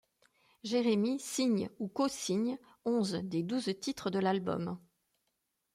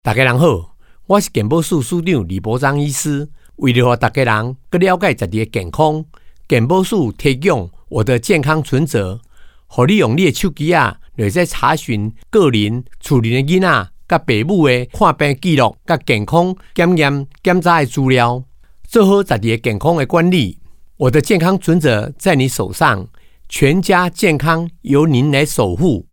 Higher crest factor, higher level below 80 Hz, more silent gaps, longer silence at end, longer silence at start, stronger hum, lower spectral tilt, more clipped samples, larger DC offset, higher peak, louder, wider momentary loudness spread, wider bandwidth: about the same, 16 dB vs 14 dB; second, -74 dBFS vs -38 dBFS; neither; first, 0.95 s vs 0.1 s; first, 0.65 s vs 0.05 s; neither; about the same, -5 dB/octave vs -6 dB/octave; neither; neither; second, -18 dBFS vs 0 dBFS; second, -34 LUFS vs -15 LUFS; about the same, 8 LU vs 7 LU; second, 15.5 kHz vs 18.5 kHz